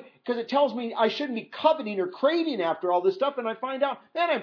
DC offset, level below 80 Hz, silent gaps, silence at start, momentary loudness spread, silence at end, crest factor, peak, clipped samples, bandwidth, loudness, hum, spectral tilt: under 0.1%; -90 dBFS; none; 0 s; 7 LU; 0 s; 18 dB; -8 dBFS; under 0.1%; 5.4 kHz; -26 LUFS; none; -6 dB/octave